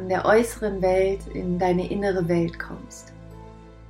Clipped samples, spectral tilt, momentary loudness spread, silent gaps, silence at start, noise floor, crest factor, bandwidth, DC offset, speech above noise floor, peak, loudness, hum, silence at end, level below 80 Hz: under 0.1%; -6.5 dB/octave; 23 LU; none; 0 s; -44 dBFS; 18 dB; 16 kHz; under 0.1%; 20 dB; -6 dBFS; -23 LUFS; none; 0.05 s; -42 dBFS